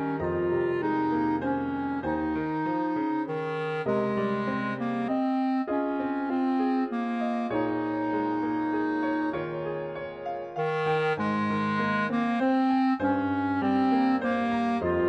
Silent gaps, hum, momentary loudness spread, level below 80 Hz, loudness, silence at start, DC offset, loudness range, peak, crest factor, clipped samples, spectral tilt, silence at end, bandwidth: none; none; 6 LU; -58 dBFS; -28 LUFS; 0 s; under 0.1%; 3 LU; -14 dBFS; 12 dB; under 0.1%; -8 dB/octave; 0 s; 6.4 kHz